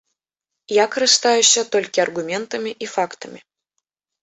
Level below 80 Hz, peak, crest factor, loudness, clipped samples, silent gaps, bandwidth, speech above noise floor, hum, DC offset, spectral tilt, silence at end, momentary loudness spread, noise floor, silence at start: -70 dBFS; 0 dBFS; 20 dB; -18 LUFS; under 0.1%; none; 8.4 kHz; 65 dB; none; under 0.1%; -0.5 dB/octave; 0.85 s; 13 LU; -84 dBFS; 0.7 s